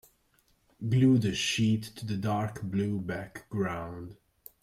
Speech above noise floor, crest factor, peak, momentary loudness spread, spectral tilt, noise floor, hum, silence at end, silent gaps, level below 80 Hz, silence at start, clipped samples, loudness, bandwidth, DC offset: 40 dB; 16 dB; -14 dBFS; 15 LU; -5.5 dB/octave; -69 dBFS; none; 0.5 s; none; -60 dBFS; 0.8 s; under 0.1%; -30 LUFS; 15.5 kHz; under 0.1%